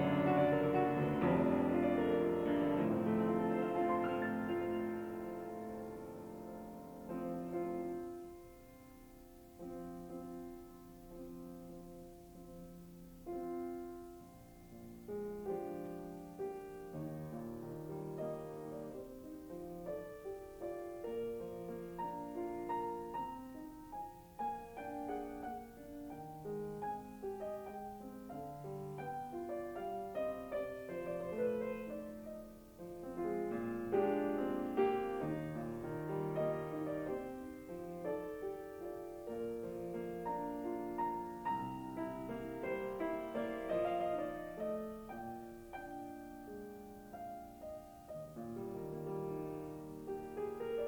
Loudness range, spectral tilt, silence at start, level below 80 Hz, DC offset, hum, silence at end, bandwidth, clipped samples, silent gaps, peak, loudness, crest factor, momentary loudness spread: 13 LU; -7.5 dB/octave; 0 s; -66 dBFS; under 0.1%; none; 0 s; over 20 kHz; under 0.1%; none; -22 dBFS; -41 LUFS; 20 dB; 17 LU